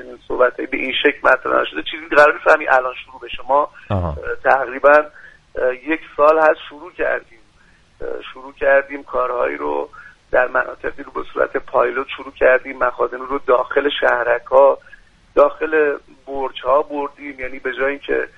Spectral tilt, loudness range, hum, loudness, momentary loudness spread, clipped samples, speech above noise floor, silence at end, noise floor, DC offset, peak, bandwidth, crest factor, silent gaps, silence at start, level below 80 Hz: -6 dB/octave; 5 LU; none; -17 LUFS; 16 LU; under 0.1%; 34 dB; 0.1 s; -52 dBFS; under 0.1%; 0 dBFS; 8.2 kHz; 18 dB; none; 0 s; -44 dBFS